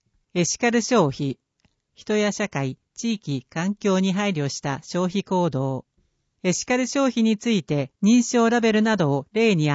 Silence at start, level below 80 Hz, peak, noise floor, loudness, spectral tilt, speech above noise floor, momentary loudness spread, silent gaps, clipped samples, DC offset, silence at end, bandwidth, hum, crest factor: 0.35 s; -62 dBFS; -8 dBFS; -68 dBFS; -23 LUFS; -5 dB/octave; 47 dB; 10 LU; none; under 0.1%; under 0.1%; 0 s; 8 kHz; none; 16 dB